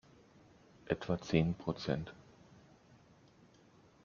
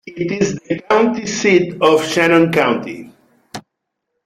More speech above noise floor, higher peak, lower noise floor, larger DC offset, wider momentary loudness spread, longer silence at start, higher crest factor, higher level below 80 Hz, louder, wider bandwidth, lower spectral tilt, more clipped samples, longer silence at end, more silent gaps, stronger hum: second, 29 dB vs 61 dB; second, -16 dBFS vs 0 dBFS; second, -64 dBFS vs -76 dBFS; neither; second, 13 LU vs 22 LU; first, 0.85 s vs 0.05 s; first, 26 dB vs 16 dB; second, -62 dBFS vs -54 dBFS; second, -37 LUFS vs -15 LUFS; second, 7.2 kHz vs 14.5 kHz; about the same, -6 dB/octave vs -5 dB/octave; neither; first, 1.85 s vs 0.65 s; neither; neither